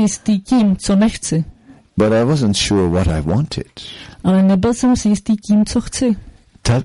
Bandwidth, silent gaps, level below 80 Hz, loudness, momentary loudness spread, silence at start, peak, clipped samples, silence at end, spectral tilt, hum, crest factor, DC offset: 11.5 kHz; none; -34 dBFS; -16 LUFS; 10 LU; 0 s; -4 dBFS; under 0.1%; 0 s; -6 dB/octave; none; 12 dB; under 0.1%